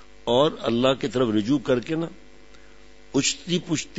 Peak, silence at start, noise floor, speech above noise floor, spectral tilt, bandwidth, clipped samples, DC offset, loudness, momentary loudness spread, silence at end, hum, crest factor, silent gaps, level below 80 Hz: -6 dBFS; 0.25 s; -51 dBFS; 28 dB; -4.5 dB/octave; 8 kHz; under 0.1%; 0.5%; -23 LUFS; 7 LU; 0 s; none; 20 dB; none; -54 dBFS